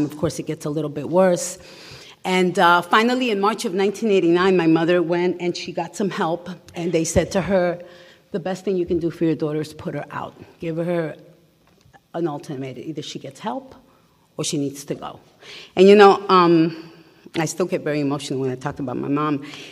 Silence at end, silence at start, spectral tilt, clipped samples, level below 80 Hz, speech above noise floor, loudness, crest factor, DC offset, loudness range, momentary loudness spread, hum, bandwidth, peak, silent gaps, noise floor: 0 s; 0 s; -5.5 dB/octave; under 0.1%; -52 dBFS; 37 dB; -20 LUFS; 20 dB; under 0.1%; 12 LU; 16 LU; none; 15 kHz; 0 dBFS; none; -57 dBFS